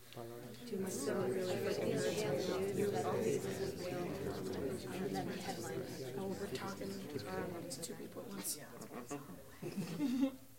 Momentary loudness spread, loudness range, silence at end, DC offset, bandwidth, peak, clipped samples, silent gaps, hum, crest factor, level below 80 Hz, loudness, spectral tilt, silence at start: 11 LU; 6 LU; 0 s; under 0.1%; 16.5 kHz; -24 dBFS; under 0.1%; none; none; 16 dB; -72 dBFS; -41 LUFS; -5 dB/octave; 0 s